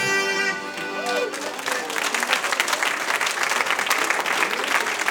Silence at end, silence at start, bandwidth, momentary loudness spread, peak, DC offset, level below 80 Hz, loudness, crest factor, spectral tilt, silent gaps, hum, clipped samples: 0 s; 0 s; 19.5 kHz; 6 LU; -2 dBFS; under 0.1%; -74 dBFS; -22 LUFS; 22 dB; -0.5 dB/octave; none; none; under 0.1%